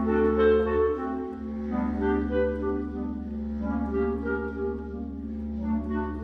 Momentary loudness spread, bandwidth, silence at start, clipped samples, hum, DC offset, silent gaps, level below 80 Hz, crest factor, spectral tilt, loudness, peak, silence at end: 12 LU; 5.2 kHz; 0 s; under 0.1%; none; under 0.1%; none; -38 dBFS; 16 dB; -9.5 dB/octave; -28 LUFS; -12 dBFS; 0 s